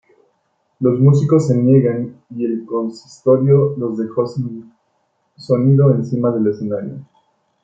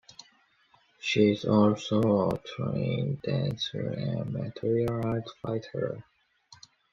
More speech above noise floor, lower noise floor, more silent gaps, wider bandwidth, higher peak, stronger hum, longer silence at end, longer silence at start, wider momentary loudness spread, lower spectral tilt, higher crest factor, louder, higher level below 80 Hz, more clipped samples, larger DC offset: first, 50 dB vs 37 dB; about the same, -66 dBFS vs -65 dBFS; neither; about the same, 7.6 kHz vs 7.6 kHz; first, -2 dBFS vs -10 dBFS; neither; first, 0.6 s vs 0.35 s; second, 0.8 s vs 1 s; about the same, 13 LU vs 11 LU; first, -10 dB/octave vs -7 dB/octave; second, 14 dB vs 20 dB; first, -16 LUFS vs -29 LUFS; about the same, -60 dBFS vs -60 dBFS; neither; neither